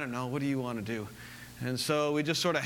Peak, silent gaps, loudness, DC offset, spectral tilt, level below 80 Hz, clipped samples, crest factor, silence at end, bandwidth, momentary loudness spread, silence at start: -14 dBFS; none; -32 LUFS; under 0.1%; -4.5 dB/octave; -64 dBFS; under 0.1%; 18 dB; 0 s; 19 kHz; 14 LU; 0 s